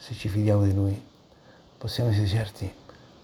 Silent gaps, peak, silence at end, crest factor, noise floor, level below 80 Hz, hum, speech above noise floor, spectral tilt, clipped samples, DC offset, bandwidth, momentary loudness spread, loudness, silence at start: none; -12 dBFS; 0.5 s; 16 dB; -54 dBFS; -52 dBFS; none; 29 dB; -7.5 dB/octave; under 0.1%; under 0.1%; 13 kHz; 15 LU; -26 LUFS; 0 s